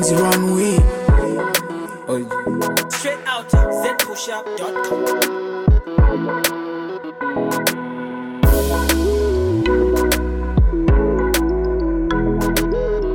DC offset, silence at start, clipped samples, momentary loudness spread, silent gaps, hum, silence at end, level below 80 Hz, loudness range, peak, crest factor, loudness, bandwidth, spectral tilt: under 0.1%; 0 s; under 0.1%; 9 LU; none; none; 0 s; -22 dBFS; 3 LU; -4 dBFS; 14 dB; -18 LUFS; 17.5 kHz; -5 dB/octave